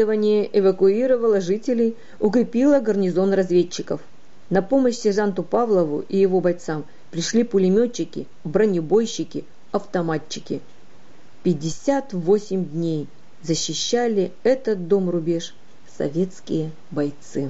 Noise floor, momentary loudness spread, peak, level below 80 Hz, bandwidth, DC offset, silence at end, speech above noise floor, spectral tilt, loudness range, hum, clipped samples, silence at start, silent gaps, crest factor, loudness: -52 dBFS; 11 LU; -8 dBFS; -60 dBFS; 8 kHz; 2%; 0 s; 31 dB; -6 dB/octave; 5 LU; none; under 0.1%; 0 s; none; 14 dB; -21 LUFS